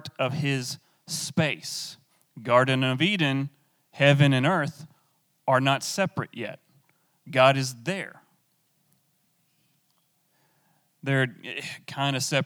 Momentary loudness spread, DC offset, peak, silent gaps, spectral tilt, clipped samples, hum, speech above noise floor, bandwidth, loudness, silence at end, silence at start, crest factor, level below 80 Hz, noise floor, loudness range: 15 LU; under 0.1%; -4 dBFS; none; -5 dB/octave; under 0.1%; none; 45 dB; 17.5 kHz; -25 LUFS; 0 s; 0.05 s; 22 dB; -80 dBFS; -70 dBFS; 10 LU